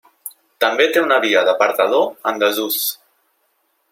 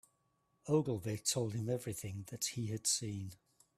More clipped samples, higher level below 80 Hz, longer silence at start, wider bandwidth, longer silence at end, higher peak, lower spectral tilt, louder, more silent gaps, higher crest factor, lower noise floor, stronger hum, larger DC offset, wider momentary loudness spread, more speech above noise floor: neither; about the same, -70 dBFS vs -70 dBFS; second, 0.25 s vs 0.65 s; about the same, 16.5 kHz vs 15.5 kHz; first, 0.95 s vs 0.4 s; first, -2 dBFS vs -18 dBFS; second, -1.5 dB/octave vs -4 dB/octave; first, -16 LUFS vs -37 LUFS; neither; about the same, 16 dB vs 20 dB; second, -65 dBFS vs -79 dBFS; neither; neither; first, 20 LU vs 11 LU; first, 49 dB vs 41 dB